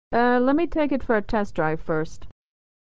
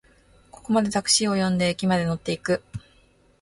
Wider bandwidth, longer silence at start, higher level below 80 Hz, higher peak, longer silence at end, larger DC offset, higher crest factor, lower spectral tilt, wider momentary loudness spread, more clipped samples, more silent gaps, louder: second, 8 kHz vs 11.5 kHz; second, 0.1 s vs 0.65 s; first, -42 dBFS vs -54 dBFS; about the same, -8 dBFS vs -6 dBFS; second, 0.4 s vs 0.6 s; first, 3% vs under 0.1%; about the same, 16 dB vs 20 dB; first, -7 dB/octave vs -4 dB/octave; second, 8 LU vs 16 LU; neither; neither; about the same, -23 LUFS vs -23 LUFS